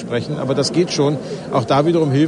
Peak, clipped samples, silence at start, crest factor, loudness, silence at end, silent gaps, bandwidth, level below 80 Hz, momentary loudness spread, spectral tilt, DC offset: -4 dBFS; under 0.1%; 0 s; 14 dB; -18 LUFS; 0 s; none; 10.5 kHz; -54 dBFS; 6 LU; -6 dB/octave; under 0.1%